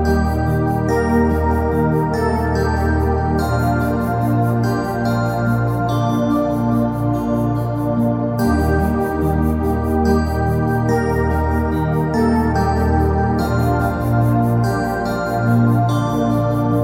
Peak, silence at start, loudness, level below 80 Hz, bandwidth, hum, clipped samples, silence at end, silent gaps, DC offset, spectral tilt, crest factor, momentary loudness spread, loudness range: -2 dBFS; 0 s; -18 LUFS; -26 dBFS; 16.5 kHz; none; under 0.1%; 0 s; none; under 0.1%; -8 dB/octave; 14 dB; 3 LU; 1 LU